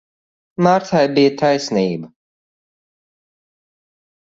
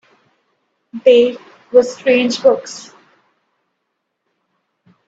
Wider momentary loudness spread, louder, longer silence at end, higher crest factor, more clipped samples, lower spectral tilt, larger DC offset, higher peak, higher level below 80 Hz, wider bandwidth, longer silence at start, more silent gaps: second, 10 LU vs 22 LU; about the same, -16 LUFS vs -14 LUFS; about the same, 2.15 s vs 2.25 s; about the same, 20 dB vs 18 dB; neither; first, -6 dB/octave vs -3.5 dB/octave; neither; about the same, 0 dBFS vs 0 dBFS; about the same, -60 dBFS vs -64 dBFS; about the same, 8 kHz vs 8 kHz; second, 0.6 s vs 0.95 s; neither